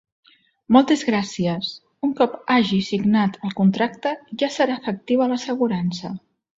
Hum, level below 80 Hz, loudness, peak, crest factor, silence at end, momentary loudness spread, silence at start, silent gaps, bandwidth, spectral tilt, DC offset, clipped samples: none; -60 dBFS; -21 LUFS; -2 dBFS; 20 dB; 0.4 s; 10 LU; 0.7 s; none; 7.8 kHz; -6 dB/octave; under 0.1%; under 0.1%